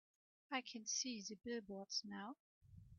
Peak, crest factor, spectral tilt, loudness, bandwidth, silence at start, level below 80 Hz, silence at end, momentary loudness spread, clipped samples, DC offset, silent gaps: -28 dBFS; 22 dB; -2 dB/octave; -46 LUFS; 7.6 kHz; 0.5 s; -78 dBFS; 0 s; 12 LU; under 0.1%; under 0.1%; 2.40-2.61 s